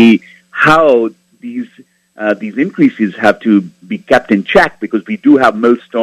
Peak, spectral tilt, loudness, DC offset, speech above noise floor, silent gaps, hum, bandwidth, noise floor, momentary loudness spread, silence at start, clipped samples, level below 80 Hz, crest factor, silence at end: 0 dBFS; -6.5 dB/octave; -11 LUFS; under 0.1%; 34 dB; none; none; 12 kHz; -45 dBFS; 16 LU; 0 s; 0.7%; -48 dBFS; 12 dB; 0 s